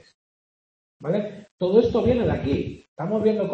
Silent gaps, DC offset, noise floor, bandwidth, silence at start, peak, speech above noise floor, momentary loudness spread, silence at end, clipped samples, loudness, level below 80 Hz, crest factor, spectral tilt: 1.51-1.58 s, 2.88-2.96 s; under 0.1%; under -90 dBFS; 7.2 kHz; 1 s; -4 dBFS; over 68 dB; 15 LU; 0 s; under 0.1%; -23 LUFS; -46 dBFS; 20 dB; -8.5 dB/octave